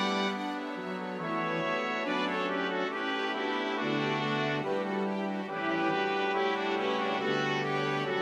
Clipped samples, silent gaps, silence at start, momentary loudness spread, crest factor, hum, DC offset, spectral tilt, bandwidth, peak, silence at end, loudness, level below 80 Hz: under 0.1%; none; 0 s; 5 LU; 14 dB; none; under 0.1%; -5.5 dB/octave; 11 kHz; -16 dBFS; 0 s; -31 LUFS; -76 dBFS